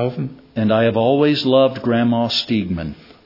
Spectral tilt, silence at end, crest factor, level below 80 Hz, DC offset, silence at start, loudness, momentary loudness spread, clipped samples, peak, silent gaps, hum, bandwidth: -7 dB/octave; 0.3 s; 16 dB; -50 dBFS; under 0.1%; 0 s; -17 LUFS; 12 LU; under 0.1%; -2 dBFS; none; none; 5.8 kHz